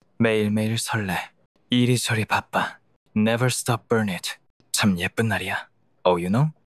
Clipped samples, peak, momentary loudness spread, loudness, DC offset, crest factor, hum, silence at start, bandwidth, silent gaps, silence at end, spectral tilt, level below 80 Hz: under 0.1%; -6 dBFS; 9 LU; -23 LUFS; under 0.1%; 18 dB; none; 0.2 s; 14.5 kHz; 1.46-1.55 s, 2.96-3.06 s, 4.50-4.60 s; 0.15 s; -5 dB/octave; -52 dBFS